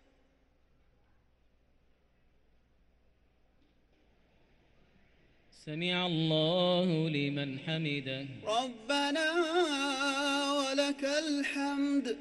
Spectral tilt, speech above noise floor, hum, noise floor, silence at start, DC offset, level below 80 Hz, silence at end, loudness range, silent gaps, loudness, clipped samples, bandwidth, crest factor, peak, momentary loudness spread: -4.5 dB/octave; 37 dB; none; -68 dBFS; 5.6 s; under 0.1%; -70 dBFS; 0 s; 6 LU; none; -31 LUFS; under 0.1%; 12 kHz; 18 dB; -16 dBFS; 7 LU